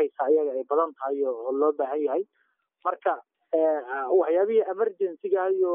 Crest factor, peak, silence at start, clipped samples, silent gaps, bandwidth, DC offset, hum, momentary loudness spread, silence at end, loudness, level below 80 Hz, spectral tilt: 14 dB; -10 dBFS; 0 s; under 0.1%; none; 3.6 kHz; under 0.1%; none; 8 LU; 0 s; -26 LUFS; under -90 dBFS; 1.5 dB/octave